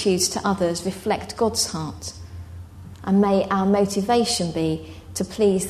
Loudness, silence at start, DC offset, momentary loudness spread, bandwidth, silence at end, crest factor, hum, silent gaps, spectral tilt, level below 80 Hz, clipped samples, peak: -22 LUFS; 0 s; under 0.1%; 18 LU; 13.5 kHz; 0 s; 16 dB; none; none; -4.5 dB/octave; -48 dBFS; under 0.1%; -6 dBFS